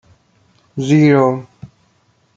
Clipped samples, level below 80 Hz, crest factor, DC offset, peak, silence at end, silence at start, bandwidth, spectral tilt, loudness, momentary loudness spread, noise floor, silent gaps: under 0.1%; -58 dBFS; 16 dB; under 0.1%; -2 dBFS; 0.7 s; 0.75 s; 7.8 kHz; -7.5 dB/octave; -14 LUFS; 16 LU; -58 dBFS; none